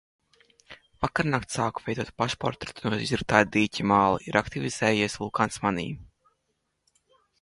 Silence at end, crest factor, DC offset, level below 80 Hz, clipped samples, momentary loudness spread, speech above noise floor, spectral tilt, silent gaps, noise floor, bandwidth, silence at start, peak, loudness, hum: 1.35 s; 24 dB; under 0.1%; -52 dBFS; under 0.1%; 10 LU; 51 dB; -5 dB/octave; none; -77 dBFS; 11.5 kHz; 0.7 s; -4 dBFS; -26 LUFS; none